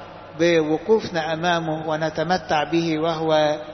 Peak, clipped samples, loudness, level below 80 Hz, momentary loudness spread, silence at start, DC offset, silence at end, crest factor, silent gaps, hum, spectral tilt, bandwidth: -6 dBFS; under 0.1%; -21 LUFS; -54 dBFS; 5 LU; 0 s; under 0.1%; 0 s; 16 dB; none; none; -5.5 dB/octave; 6.4 kHz